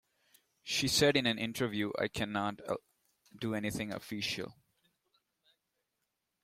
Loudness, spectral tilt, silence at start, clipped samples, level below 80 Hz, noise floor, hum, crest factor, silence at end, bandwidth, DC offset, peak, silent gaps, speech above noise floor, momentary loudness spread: -34 LUFS; -3.5 dB/octave; 0.65 s; under 0.1%; -66 dBFS; -85 dBFS; none; 22 dB; 1.9 s; 16.5 kHz; under 0.1%; -14 dBFS; none; 51 dB; 13 LU